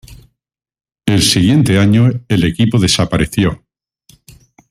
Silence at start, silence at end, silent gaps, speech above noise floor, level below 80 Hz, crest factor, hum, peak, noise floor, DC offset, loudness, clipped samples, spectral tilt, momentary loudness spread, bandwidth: 0.1 s; 1.15 s; none; 67 dB; -36 dBFS; 14 dB; none; 0 dBFS; -79 dBFS; under 0.1%; -12 LUFS; under 0.1%; -5 dB/octave; 6 LU; 15.5 kHz